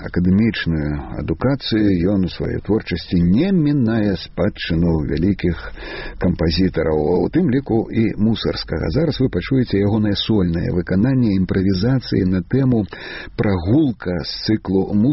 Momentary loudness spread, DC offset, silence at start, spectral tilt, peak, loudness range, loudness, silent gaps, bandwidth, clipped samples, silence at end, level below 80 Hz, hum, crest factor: 6 LU; under 0.1%; 0 s; -6.5 dB/octave; -6 dBFS; 1 LU; -18 LUFS; none; 6 kHz; under 0.1%; 0 s; -34 dBFS; none; 12 dB